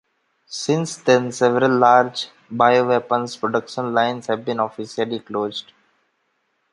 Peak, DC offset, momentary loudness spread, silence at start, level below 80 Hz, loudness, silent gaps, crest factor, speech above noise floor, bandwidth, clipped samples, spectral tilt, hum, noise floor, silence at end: -2 dBFS; under 0.1%; 12 LU; 0.5 s; -68 dBFS; -20 LUFS; none; 18 dB; 50 dB; 11.5 kHz; under 0.1%; -5 dB/octave; none; -69 dBFS; 1.1 s